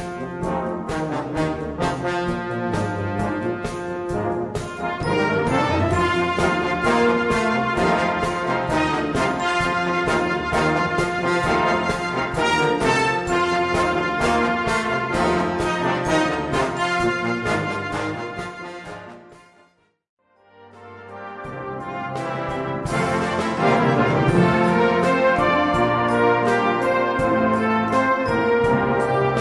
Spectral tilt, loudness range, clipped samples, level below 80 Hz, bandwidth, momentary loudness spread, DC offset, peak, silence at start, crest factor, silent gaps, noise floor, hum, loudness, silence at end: -5.5 dB/octave; 10 LU; under 0.1%; -44 dBFS; 12 kHz; 10 LU; under 0.1%; -4 dBFS; 0 s; 18 dB; 20.09-20.17 s; -59 dBFS; none; -21 LUFS; 0 s